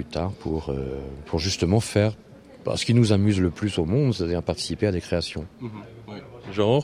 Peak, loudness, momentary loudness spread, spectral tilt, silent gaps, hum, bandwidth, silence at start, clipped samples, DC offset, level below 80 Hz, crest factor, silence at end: -6 dBFS; -24 LUFS; 17 LU; -6 dB/octave; none; none; 14 kHz; 0 s; under 0.1%; under 0.1%; -44 dBFS; 18 dB; 0 s